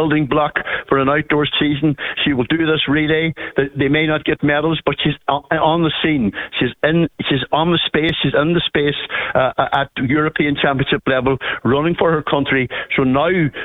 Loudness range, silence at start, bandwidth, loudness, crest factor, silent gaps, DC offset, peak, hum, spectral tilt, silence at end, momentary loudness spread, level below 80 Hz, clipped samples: 1 LU; 0 s; 4.1 kHz; -17 LUFS; 14 dB; none; under 0.1%; -2 dBFS; none; -8.5 dB/octave; 0 s; 4 LU; -42 dBFS; under 0.1%